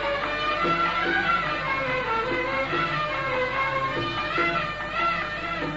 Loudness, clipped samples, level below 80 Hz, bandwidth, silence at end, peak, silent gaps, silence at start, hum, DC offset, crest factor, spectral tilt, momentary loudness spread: -25 LUFS; under 0.1%; -46 dBFS; 8 kHz; 0 s; -12 dBFS; none; 0 s; none; under 0.1%; 14 dB; -5 dB/octave; 4 LU